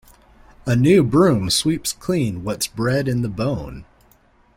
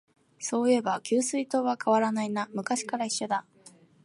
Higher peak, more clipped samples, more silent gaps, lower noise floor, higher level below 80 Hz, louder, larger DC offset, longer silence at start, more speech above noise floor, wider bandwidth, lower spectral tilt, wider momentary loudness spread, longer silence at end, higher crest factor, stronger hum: first, -2 dBFS vs -12 dBFS; neither; neither; about the same, -55 dBFS vs -56 dBFS; first, -44 dBFS vs -82 dBFS; first, -19 LUFS vs -28 LUFS; neither; first, 0.65 s vs 0.4 s; first, 37 dB vs 29 dB; first, 16.5 kHz vs 11.5 kHz; first, -5.5 dB/octave vs -3.5 dB/octave; first, 10 LU vs 7 LU; first, 0.75 s vs 0.35 s; about the same, 18 dB vs 16 dB; neither